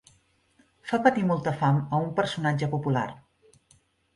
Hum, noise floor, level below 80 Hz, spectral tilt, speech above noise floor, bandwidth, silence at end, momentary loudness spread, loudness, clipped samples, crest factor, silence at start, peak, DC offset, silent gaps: none; -65 dBFS; -62 dBFS; -7 dB/octave; 40 dB; 11.5 kHz; 0.95 s; 7 LU; -26 LUFS; under 0.1%; 22 dB; 0.85 s; -6 dBFS; under 0.1%; none